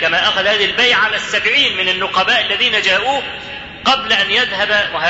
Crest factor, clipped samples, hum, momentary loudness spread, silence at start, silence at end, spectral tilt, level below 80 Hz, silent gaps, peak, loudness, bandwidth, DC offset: 14 dB; under 0.1%; none; 7 LU; 0 s; 0 s; -1.5 dB/octave; -48 dBFS; none; -2 dBFS; -13 LUFS; 8 kHz; under 0.1%